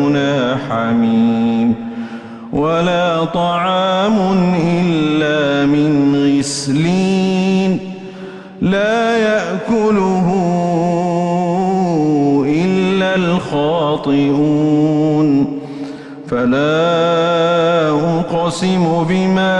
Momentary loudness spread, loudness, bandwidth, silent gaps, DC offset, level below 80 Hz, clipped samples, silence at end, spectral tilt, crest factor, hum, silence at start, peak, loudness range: 7 LU; -14 LUFS; 11 kHz; none; under 0.1%; -48 dBFS; under 0.1%; 0 s; -6.5 dB/octave; 10 dB; none; 0 s; -4 dBFS; 2 LU